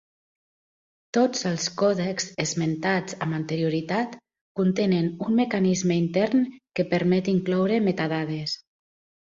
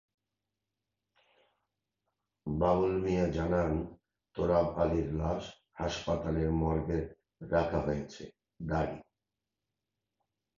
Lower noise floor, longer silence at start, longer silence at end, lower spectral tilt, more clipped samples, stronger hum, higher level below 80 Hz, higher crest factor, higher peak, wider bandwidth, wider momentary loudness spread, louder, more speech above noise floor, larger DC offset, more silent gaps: about the same, under -90 dBFS vs -89 dBFS; second, 1.15 s vs 2.45 s; second, 0.65 s vs 1.55 s; second, -5.5 dB/octave vs -7.5 dB/octave; neither; second, none vs 50 Hz at -65 dBFS; second, -64 dBFS vs -46 dBFS; about the same, 16 dB vs 20 dB; first, -10 dBFS vs -14 dBFS; about the same, 7.6 kHz vs 7.4 kHz; second, 7 LU vs 16 LU; first, -25 LUFS vs -32 LUFS; first, over 66 dB vs 58 dB; neither; first, 4.41-4.55 s vs none